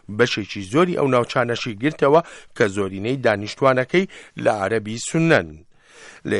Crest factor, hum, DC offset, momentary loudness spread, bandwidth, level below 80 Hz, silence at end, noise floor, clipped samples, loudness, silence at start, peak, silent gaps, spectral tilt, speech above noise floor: 18 dB; none; under 0.1%; 7 LU; 11.5 kHz; -56 dBFS; 0 s; -45 dBFS; under 0.1%; -20 LUFS; 0.1 s; -4 dBFS; none; -5.5 dB/octave; 25 dB